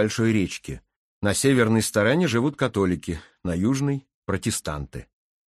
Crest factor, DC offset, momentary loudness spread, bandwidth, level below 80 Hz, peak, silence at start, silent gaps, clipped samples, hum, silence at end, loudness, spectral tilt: 18 dB; under 0.1%; 14 LU; 13 kHz; -46 dBFS; -6 dBFS; 0 s; 0.96-1.21 s, 4.14-4.22 s; under 0.1%; none; 0.45 s; -24 LUFS; -5 dB/octave